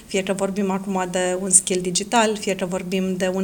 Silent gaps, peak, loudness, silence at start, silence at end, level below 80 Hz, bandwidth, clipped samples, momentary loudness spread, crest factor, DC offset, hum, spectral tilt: none; 0 dBFS; -21 LUFS; 0 s; 0 s; -54 dBFS; 19.5 kHz; under 0.1%; 9 LU; 22 dB; under 0.1%; none; -3.5 dB/octave